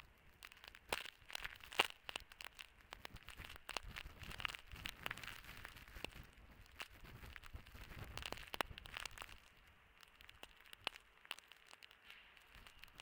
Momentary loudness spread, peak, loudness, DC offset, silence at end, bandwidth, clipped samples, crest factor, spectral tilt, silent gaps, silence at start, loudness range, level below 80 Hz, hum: 16 LU; -14 dBFS; -49 LUFS; under 0.1%; 0 s; 18 kHz; under 0.1%; 38 dB; -2 dB/octave; none; 0 s; 8 LU; -64 dBFS; none